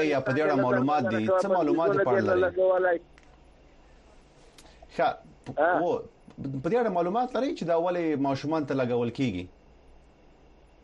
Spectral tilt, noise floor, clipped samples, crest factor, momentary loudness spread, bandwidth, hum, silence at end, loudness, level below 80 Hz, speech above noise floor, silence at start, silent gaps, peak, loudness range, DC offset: -7 dB/octave; -56 dBFS; under 0.1%; 16 dB; 10 LU; 10 kHz; none; 1.35 s; -26 LUFS; -58 dBFS; 30 dB; 0 s; none; -12 dBFS; 6 LU; under 0.1%